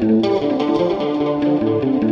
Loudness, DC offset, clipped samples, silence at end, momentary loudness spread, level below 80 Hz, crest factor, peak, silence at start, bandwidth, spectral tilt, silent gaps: -18 LUFS; under 0.1%; under 0.1%; 0 s; 3 LU; -50 dBFS; 12 dB; -6 dBFS; 0 s; 7 kHz; -8 dB/octave; none